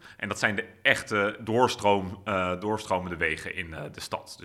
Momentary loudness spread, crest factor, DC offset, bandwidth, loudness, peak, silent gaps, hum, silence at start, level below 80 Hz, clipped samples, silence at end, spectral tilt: 12 LU; 24 dB; under 0.1%; 15.5 kHz; -27 LUFS; -4 dBFS; none; none; 0.05 s; -56 dBFS; under 0.1%; 0 s; -4.5 dB/octave